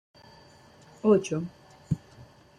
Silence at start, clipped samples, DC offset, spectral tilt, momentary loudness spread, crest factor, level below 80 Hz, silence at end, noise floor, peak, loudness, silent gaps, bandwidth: 1.05 s; under 0.1%; under 0.1%; -7 dB/octave; 11 LU; 20 dB; -58 dBFS; 0.6 s; -54 dBFS; -10 dBFS; -28 LUFS; none; 11 kHz